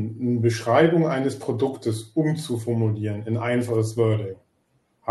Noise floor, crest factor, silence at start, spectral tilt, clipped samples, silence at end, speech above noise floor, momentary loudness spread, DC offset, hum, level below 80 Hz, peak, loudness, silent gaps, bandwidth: -67 dBFS; 18 dB; 0 s; -7 dB/octave; under 0.1%; 0 s; 45 dB; 9 LU; under 0.1%; none; -66 dBFS; -4 dBFS; -23 LUFS; none; 12.5 kHz